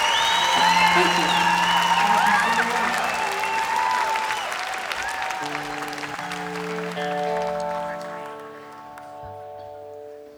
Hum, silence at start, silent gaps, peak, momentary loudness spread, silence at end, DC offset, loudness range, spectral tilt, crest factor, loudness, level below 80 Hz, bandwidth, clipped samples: none; 0 s; none; -6 dBFS; 21 LU; 0 s; under 0.1%; 11 LU; -2 dB/octave; 18 dB; -21 LUFS; -58 dBFS; over 20 kHz; under 0.1%